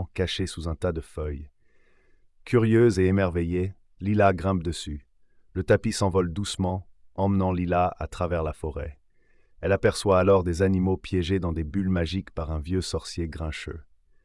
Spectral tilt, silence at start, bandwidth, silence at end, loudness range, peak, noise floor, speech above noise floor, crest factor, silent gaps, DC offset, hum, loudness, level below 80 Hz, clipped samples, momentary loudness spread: -6.5 dB/octave; 0 s; 12 kHz; 0.4 s; 4 LU; -8 dBFS; -59 dBFS; 34 dB; 18 dB; none; under 0.1%; none; -26 LUFS; -44 dBFS; under 0.1%; 13 LU